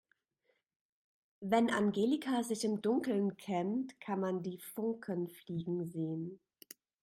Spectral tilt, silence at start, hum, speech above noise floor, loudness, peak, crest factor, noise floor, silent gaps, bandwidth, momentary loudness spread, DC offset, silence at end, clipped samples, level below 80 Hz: -6 dB/octave; 1.4 s; none; 45 dB; -36 LUFS; -18 dBFS; 18 dB; -80 dBFS; none; 16 kHz; 11 LU; under 0.1%; 0.65 s; under 0.1%; -78 dBFS